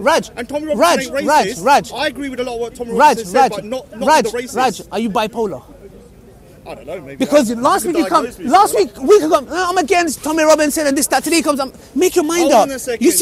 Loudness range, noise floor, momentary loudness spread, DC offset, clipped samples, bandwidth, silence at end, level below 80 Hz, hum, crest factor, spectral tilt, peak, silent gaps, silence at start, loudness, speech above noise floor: 5 LU; -41 dBFS; 11 LU; under 0.1%; under 0.1%; 16 kHz; 0 s; -46 dBFS; none; 16 dB; -3 dB/octave; 0 dBFS; none; 0 s; -15 LUFS; 27 dB